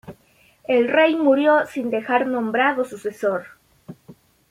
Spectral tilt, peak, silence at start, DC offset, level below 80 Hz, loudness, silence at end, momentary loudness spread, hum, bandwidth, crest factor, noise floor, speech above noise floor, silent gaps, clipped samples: -5.5 dB/octave; -4 dBFS; 0.05 s; under 0.1%; -66 dBFS; -20 LUFS; 0.4 s; 9 LU; none; 15 kHz; 18 dB; -57 dBFS; 38 dB; none; under 0.1%